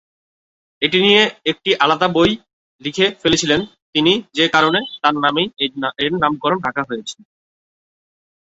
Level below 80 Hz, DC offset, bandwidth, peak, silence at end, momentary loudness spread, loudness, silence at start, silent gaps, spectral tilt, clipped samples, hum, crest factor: -52 dBFS; under 0.1%; 8 kHz; 0 dBFS; 1.3 s; 10 LU; -16 LUFS; 0.8 s; 2.53-2.79 s, 3.82-3.93 s; -4 dB/octave; under 0.1%; none; 18 dB